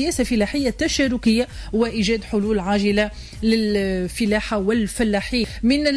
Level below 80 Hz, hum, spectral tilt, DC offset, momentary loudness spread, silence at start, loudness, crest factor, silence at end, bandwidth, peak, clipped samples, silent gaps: -36 dBFS; none; -4.5 dB/octave; under 0.1%; 4 LU; 0 s; -21 LUFS; 12 dB; 0 s; 11 kHz; -8 dBFS; under 0.1%; none